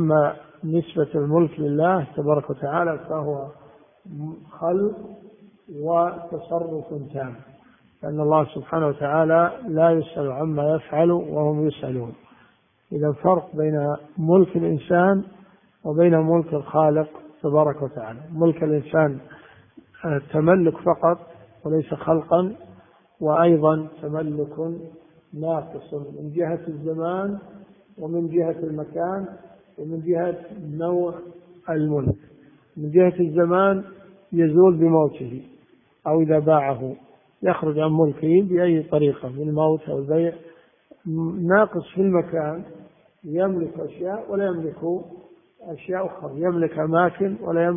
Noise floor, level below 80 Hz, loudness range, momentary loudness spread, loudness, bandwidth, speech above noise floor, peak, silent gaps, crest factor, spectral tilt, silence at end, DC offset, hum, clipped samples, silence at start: -59 dBFS; -58 dBFS; 7 LU; 16 LU; -22 LUFS; 3.7 kHz; 38 dB; -2 dBFS; none; 20 dB; -13 dB/octave; 0 s; under 0.1%; none; under 0.1%; 0 s